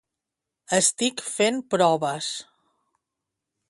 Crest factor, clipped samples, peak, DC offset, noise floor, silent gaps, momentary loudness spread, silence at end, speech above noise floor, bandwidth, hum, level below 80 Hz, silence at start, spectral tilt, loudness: 20 dB; under 0.1%; -6 dBFS; under 0.1%; -86 dBFS; none; 9 LU; 1.25 s; 62 dB; 12 kHz; none; -72 dBFS; 0.7 s; -2.5 dB/octave; -23 LUFS